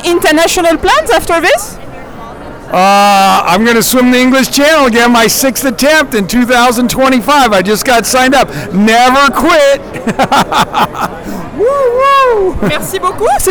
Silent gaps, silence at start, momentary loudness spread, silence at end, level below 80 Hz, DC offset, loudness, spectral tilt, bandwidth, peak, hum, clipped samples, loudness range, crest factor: none; 0 s; 9 LU; 0 s; -32 dBFS; under 0.1%; -8 LUFS; -3.5 dB/octave; over 20 kHz; -2 dBFS; none; under 0.1%; 3 LU; 6 dB